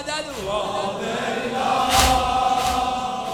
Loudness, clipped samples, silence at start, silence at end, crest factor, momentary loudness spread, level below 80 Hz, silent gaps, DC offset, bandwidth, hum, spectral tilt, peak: -21 LUFS; under 0.1%; 0 s; 0 s; 20 dB; 9 LU; -36 dBFS; none; under 0.1%; over 20 kHz; none; -3 dB/octave; -2 dBFS